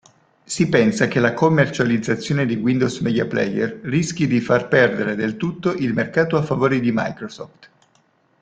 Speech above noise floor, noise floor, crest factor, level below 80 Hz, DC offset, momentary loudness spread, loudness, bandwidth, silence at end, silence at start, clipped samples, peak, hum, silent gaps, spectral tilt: 42 dB; -60 dBFS; 18 dB; -54 dBFS; under 0.1%; 7 LU; -19 LUFS; 9.4 kHz; 0.75 s; 0.5 s; under 0.1%; -2 dBFS; none; none; -6 dB/octave